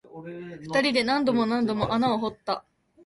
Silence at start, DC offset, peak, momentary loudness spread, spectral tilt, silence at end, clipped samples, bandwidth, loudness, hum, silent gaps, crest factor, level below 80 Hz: 0.1 s; under 0.1%; -10 dBFS; 16 LU; -5.5 dB/octave; 0.45 s; under 0.1%; 11.5 kHz; -25 LUFS; none; none; 16 dB; -58 dBFS